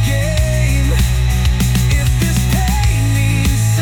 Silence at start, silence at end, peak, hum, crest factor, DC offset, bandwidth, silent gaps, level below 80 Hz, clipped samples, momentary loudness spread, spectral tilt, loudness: 0 s; 0 s; -4 dBFS; none; 10 dB; under 0.1%; 18.5 kHz; none; -18 dBFS; under 0.1%; 1 LU; -5 dB/octave; -15 LUFS